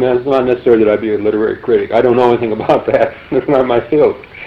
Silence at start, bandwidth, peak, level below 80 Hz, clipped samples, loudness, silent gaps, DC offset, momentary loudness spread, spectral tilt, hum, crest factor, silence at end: 0 s; 6.2 kHz; 0 dBFS; -44 dBFS; under 0.1%; -13 LUFS; none; under 0.1%; 4 LU; -8.5 dB/octave; none; 12 dB; 0 s